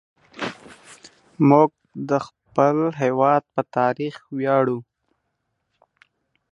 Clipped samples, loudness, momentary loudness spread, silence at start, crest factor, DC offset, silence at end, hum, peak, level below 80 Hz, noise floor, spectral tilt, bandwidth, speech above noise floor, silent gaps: under 0.1%; -21 LUFS; 15 LU; 0.35 s; 20 dB; under 0.1%; 1.7 s; none; -2 dBFS; -68 dBFS; -75 dBFS; -7.5 dB/octave; 11 kHz; 56 dB; none